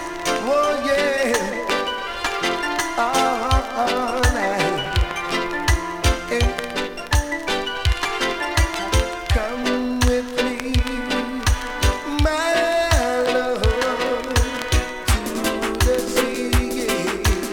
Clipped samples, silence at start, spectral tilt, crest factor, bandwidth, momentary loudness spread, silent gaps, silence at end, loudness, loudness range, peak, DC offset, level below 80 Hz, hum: under 0.1%; 0 s; -4 dB/octave; 18 dB; 19 kHz; 4 LU; none; 0 s; -21 LUFS; 2 LU; -2 dBFS; under 0.1%; -26 dBFS; none